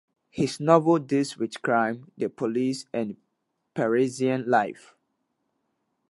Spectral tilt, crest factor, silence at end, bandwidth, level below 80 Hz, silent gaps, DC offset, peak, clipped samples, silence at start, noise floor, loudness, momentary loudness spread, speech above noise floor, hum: -6 dB/octave; 24 dB; 1.4 s; 11.5 kHz; -70 dBFS; none; under 0.1%; -4 dBFS; under 0.1%; 0.35 s; -78 dBFS; -25 LUFS; 12 LU; 53 dB; none